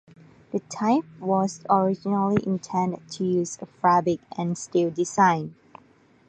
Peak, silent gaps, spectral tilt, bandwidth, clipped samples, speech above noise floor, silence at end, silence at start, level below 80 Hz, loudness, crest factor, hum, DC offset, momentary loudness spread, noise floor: -6 dBFS; none; -6 dB/octave; 9.4 kHz; under 0.1%; 33 dB; 0.75 s; 0.55 s; -64 dBFS; -24 LUFS; 20 dB; none; under 0.1%; 9 LU; -57 dBFS